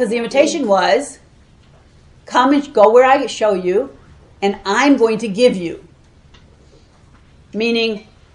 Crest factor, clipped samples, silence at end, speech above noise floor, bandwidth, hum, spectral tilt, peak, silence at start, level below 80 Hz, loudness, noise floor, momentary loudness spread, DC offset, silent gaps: 16 dB; under 0.1%; 0.3 s; 33 dB; 11.5 kHz; none; -4.5 dB/octave; 0 dBFS; 0 s; -50 dBFS; -15 LUFS; -47 dBFS; 15 LU; under 0.1%; none